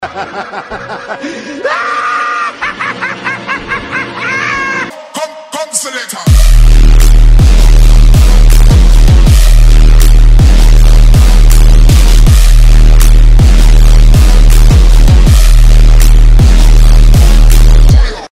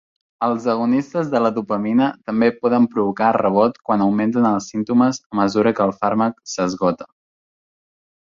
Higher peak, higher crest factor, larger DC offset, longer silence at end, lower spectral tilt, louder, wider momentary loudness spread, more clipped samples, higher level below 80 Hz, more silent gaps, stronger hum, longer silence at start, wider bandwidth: about the same, 0 dBFS vs -2 dBFS; second, 4 dB vs 16 dB; neither; second, 0.05 s vs 1.3 s; second, -5 dB/octave vs -6.5 dB/octave; first, -8 LUFS vs -19 LUFS; first, 12 LU vs 5 LU; first, 7% vs under 0.1%; first, -4 dBFS vs -58 dBFS; second, none vs 5.26-5.30 s; neither; second, 0 s vs 0.4 s; first, 15 kHz vs 7.6 kHz